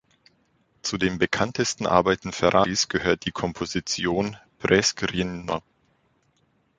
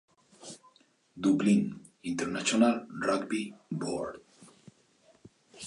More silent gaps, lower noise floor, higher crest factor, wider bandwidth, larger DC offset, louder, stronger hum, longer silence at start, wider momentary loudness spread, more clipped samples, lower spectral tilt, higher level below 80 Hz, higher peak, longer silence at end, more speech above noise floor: neither; about the same, -67 dBFS vs -65 dBFS; about the same, 22 dB vs 20 dB; second, 9.6 kHz vs 11 kHz; neither; first, -24 LUFS vs -30 LUFS; neither; first, 0.85 s vs 0.4 s; second, 10 LU vs 22 LU; neither; about the same, -4 dB/octave vs -5 dB/octave; first, -50 dBFS vs -70 dBFS; first, -2 dBFS vs -12 dBFS; first, 1.2 s vs 0 s; first, 43 dB vs 36 dB